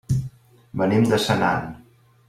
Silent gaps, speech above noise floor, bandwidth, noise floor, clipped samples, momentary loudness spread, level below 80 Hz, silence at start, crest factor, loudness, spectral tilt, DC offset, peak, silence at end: none; 20 dB; 15.5 kHz; -40 dBFS; under 0.1%; 17 LU; -50 dBFS; 0.1 s; 18 dB; -21 LUFS; -6 dB/octave; under 0.1%; -6 dBFS; 0.5 s